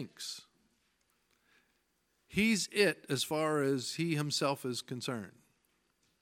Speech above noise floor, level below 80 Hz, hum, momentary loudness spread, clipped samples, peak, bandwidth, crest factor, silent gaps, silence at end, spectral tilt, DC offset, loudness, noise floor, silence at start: 44 dB; -70 dBFS; 60 Hz at -65 dBFS; 13 LU; under 0.1%; -14 dBFS; 17 kHz; 22 dB; none; 0.9 s; -4 dB/octave; under 0.1%; -33 LUFS; -77 dBFS; 0 s